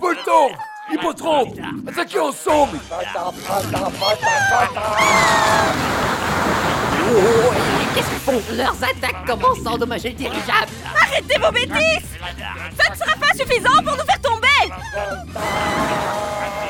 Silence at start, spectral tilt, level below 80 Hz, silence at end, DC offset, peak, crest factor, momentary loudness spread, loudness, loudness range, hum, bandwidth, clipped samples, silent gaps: 0 s; -3.5 dB/octave; -40 dBFS; 0 s; under 0.1%; 0 dBFS; 18 dB; 11 LU; -18 LUFS; 4 LU; none; 18 kHz; under 0.1%; none